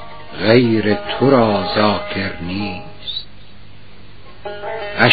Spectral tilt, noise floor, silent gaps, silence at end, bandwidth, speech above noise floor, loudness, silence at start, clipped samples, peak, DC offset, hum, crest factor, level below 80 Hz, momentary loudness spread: -4 dB/octave; -42 dBFS; none; 0 s; 5.2 kHz; 27 dB; -17 LUFS; 0 s; under 0.1%; 0 dBFS; 2%; 50 Hz at -45 dBFS; 18 dB; -46 dBFS; 16 LU